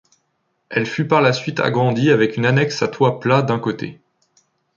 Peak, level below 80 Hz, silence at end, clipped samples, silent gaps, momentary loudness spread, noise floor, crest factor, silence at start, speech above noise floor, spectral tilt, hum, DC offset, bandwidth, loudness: -2 dBFS; -60 dBFS; 0.85 s; under 0.1%; none; 8 LU; -69 dBFS; 18 dB; 0.7 s; 52 dB; -6.5 dB/octave; none; under 0.1%; 7.4 kHz; -18 LUFS